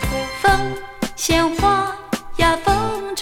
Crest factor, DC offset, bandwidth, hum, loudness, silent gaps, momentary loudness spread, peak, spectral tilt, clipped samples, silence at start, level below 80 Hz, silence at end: 20 dB; under 0.1%; 18.5 kHz; none; -19 LUFS; none; 11 LU; 0 dBFS; -4 dB/octave; under 0.1%; 0 s; -32 dBFS; 0 s